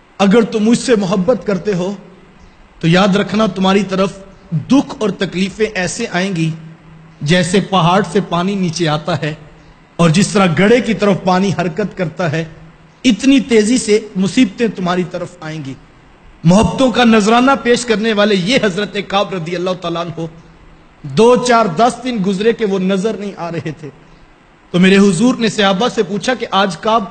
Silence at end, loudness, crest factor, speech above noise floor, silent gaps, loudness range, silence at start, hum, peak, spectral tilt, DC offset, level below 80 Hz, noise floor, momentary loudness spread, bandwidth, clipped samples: 0 s; -14 LUFS; 14 dB; 31 dB; none; 3 LU; 0.2 s; none; 0 dBFS; -5.5 dB/octave; under 0.1%; -42 dBFS; -45 dBFS; 12 LU; 9.2 kHz; under 0.1%